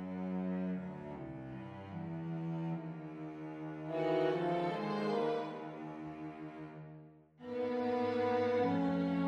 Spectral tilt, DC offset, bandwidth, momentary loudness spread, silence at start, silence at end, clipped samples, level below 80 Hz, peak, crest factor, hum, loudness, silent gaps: -8.5 dB/octave; under 0.1%; 8.4 kHz; 14 LU; 0 s; 0 s; under 0.1%; -72 dBFS; -22 dBFS; 16 dB; none; -38 LUFS; none